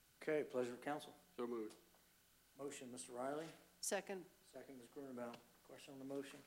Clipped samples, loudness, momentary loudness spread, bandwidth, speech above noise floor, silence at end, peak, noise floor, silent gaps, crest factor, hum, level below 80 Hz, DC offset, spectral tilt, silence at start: under 0.1%; -49 LUFS; 16 LU; 16 kHz; 25 dB; 0 s; -30 dBFS; -73 dBFS; none; 20 dB; none; -86 dBFS; under 0.1%; -3.5 dB/octave; 0.2 s